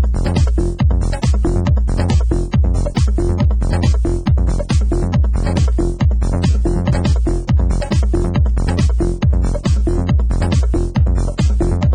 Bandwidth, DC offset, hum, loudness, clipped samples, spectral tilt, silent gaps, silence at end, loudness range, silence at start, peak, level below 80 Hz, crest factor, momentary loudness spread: 10 kHz; under 0.1%; none; -17 LUFS; under 0.1%; -7.5 dB/octave; none; 0 s; 0 LU; 0 s; -2 dBFS; -16 dBFS; 10 dB; 1 LU